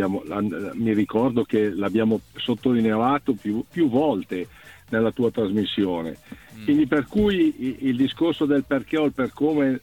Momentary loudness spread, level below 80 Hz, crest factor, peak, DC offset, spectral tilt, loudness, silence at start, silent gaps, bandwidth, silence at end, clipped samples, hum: 7 LU; -52 dBFS; 16 dB; -6 dBFS; 0.1%; -7.5 dB/octave; -23 LUFS; 0 s; none; 16.5 kHz; 0.05 s; under 0.1%; none